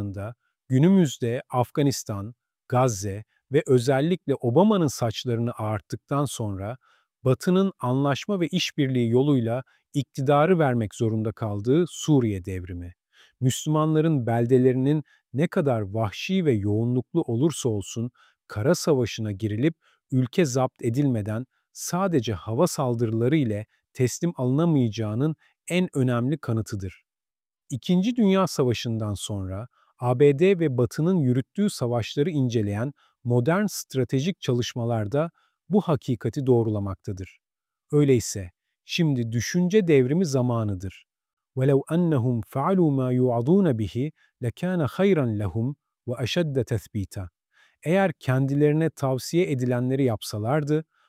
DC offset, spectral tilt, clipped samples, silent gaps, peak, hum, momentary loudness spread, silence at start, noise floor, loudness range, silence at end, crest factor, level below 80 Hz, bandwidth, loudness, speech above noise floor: under 0.1%; -6.5 dB/octave; under 0.1%; 41.33-41.37 s; -6 dBFS; none; 13 LU; 0 s; under -90 dBFS; 3 LU; 0.25 s; 18 dB; -58 dBFS; 15.5 kHz; -24 LUFS; over 67 dB